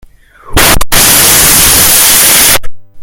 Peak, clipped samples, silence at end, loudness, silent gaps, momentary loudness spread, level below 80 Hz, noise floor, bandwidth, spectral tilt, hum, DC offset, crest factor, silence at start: 0 dBFS; 8%; 0 s; -3 LUFS; none; 5 LU; -20 dBFS; -29 dBFS; over 20 kHz; -0.5 dB/octave; none; under 0.1%; 6 dB; 0.45 s